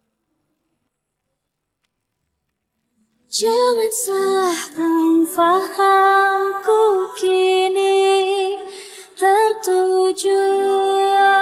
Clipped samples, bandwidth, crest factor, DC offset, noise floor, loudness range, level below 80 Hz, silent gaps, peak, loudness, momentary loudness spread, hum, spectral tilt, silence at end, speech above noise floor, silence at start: under 0.1%; 16 kHz; 12 dB; under 0.1%; -76 dBFS; 7 LU; -70 dBFS; none; -4 dBFS; -16 LUFS; 7 LU; none; -1.5 dB/octave; 0 s; 61 dB; 3.3 s